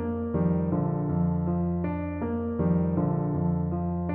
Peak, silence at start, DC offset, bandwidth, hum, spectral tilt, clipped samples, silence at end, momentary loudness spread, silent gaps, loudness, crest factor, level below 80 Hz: -14 dBFS; 0 s; under 0.1%; 2.7 kHz; none; -12 dB/octave; under 0.1%; 0 s; 4 LU; none; -27 LUFS; 12 dB; -44 dBFS